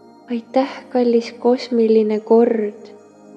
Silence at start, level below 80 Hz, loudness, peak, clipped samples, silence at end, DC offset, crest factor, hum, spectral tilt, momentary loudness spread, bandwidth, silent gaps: 0.3 s; -80 dBFS; -18 LUFS; -2 dBFS; under 0.1%; 0.4 s; under 0.1%; 16 dB; none; -6.5 dB/octave; 10 LU; 7.8 kHz; none